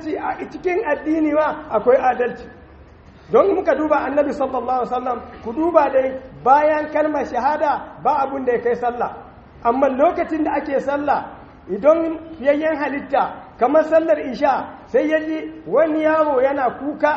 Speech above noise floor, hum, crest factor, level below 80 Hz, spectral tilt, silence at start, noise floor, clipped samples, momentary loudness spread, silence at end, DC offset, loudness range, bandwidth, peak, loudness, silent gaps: 26 dB; none; 18 dB; -50 dBFS; -4.5 dB/octave; 0 s; -44 dBFS; under 0.1%; 9 LU; 0 s; under 0.1%; 2 LU; 7.2 kHz; 0 dBFS; -19 LUFS; none